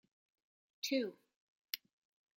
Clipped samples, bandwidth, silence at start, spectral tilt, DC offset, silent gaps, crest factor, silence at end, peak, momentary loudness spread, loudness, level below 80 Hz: under 0.1%; 16.5 kHz; 0.85 s; -2.5 dB/octave; under 0.1%; 1.36-1.62 s; 28 dB; 0.6 s; -16 dBFS; 8 LU; -41 LUFS; under -90 dBFS